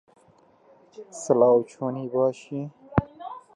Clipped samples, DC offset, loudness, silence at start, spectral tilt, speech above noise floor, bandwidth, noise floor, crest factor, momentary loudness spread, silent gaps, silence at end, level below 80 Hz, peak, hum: under 0.1%; under 0.1%; -24 LUFS; 1 s; -7.5 dB/octave; 35 dB; 11 kHz; -58 dBFS; 24 dB; 20 LU; none; 0.15 s; -52 dBFS; -2 dBFS; none